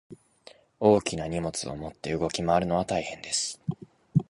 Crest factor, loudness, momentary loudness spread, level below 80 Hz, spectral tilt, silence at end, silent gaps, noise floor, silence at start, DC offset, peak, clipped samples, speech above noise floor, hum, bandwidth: 22 dB; -28 LUFS; 13 LU; -52 dBFS; -5 dB/octave; 0.05 s; none; -55 dBFS; 0.1 s; under 0.1%; -8 dBFS; under 0.1%; 28 dB; none; 11.5 kHz